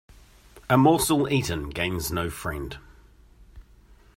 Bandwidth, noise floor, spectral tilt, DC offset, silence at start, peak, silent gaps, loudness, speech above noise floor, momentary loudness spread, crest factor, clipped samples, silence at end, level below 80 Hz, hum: 16 kHz; -54 dBFS; -5 dB/octave; under 0.1%; 0.55 s; -6 dBFS; none; -24 LUFS; 30 dB; 18 LU; 22 dB; under 0.1%; 0.55 s; -46 dBFS; none